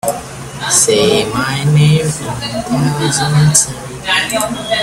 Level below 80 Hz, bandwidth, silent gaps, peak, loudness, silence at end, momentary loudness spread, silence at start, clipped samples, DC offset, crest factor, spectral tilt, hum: -40 dBFS; 15.5 kHz; none; 0 dBFS; -13 LUFS; 0 s; 11 LU; 0.05 s; under 0.1%; under 0.1%; 14 dB; -4 dB/octave; none